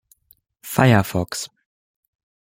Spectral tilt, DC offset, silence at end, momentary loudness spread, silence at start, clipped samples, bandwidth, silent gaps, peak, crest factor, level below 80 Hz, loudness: -5.5 dB/octave; under 0.1%; 1 s; 19 LU; 0.65 s; under 0.1%; 16.5 kHz; none; -2 dBFS; 20 dB; -52 dBFS; -19 LUFS